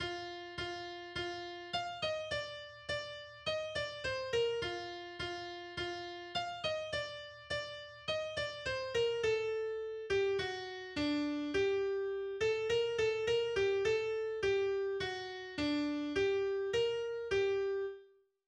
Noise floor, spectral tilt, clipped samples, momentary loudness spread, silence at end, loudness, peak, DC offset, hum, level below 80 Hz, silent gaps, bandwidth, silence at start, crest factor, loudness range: -63 dBFS; -4 dB/octave; under 0.1%; 9 LU; 0.4 s; -37 LUFS; -22 dBFS; under 0.1%; none; -62 dBFS; none; 10 kHz; 0 s; 14 dB; 6 LU